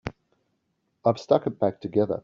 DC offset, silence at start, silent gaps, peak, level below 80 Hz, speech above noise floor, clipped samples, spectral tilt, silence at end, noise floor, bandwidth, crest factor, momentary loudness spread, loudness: under 0.1%; 0.05 s; none; -6 dBFS; -58 dBFS; 51 dB; under 0.1%; -7 dB/octave; 0.05 s; -75 dBFS; 7.4 kHz; 22 dB; 5 LU; -25 LUFS